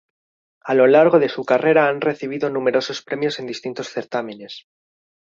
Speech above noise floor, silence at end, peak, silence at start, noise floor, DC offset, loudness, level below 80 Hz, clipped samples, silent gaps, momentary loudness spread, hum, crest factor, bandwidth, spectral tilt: over 72 dB; 0.7 s; -2 dBFS; 0.65 s; under -90 dBFS; under 0.1%; -19 LUFS; -68 dBFS; under 0.1%; none; 18 LU; none; 18 dB; 7.6 kHz; -5.5 dB/octave